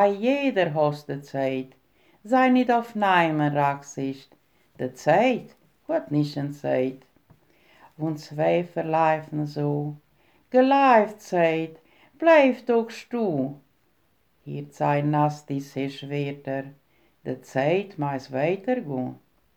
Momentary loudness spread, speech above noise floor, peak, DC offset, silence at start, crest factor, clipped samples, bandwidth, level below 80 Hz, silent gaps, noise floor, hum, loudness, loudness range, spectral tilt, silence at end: 14 LU; 44 dB; -6 dBFS; under 0.1%; 0 s; 20 dB; under 0.1%; 14.5 kHz; -72 dBFS; none; -68 dBFS; none; -24 LUFS; 7 LU; -7 dB/octave; 0.4 s